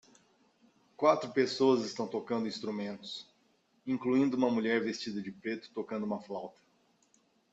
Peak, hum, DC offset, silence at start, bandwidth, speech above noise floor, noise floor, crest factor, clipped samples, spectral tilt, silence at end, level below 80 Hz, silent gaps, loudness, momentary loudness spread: -12 dBFS; none; under 0.1%; 1 s; 8 kHz; 39 dB; -71 dBFS; 22 dB; under 0.1%; -5.5 dB/octave; 1.05 s; -78 dBFS; none; -33 LUFS; 14 LU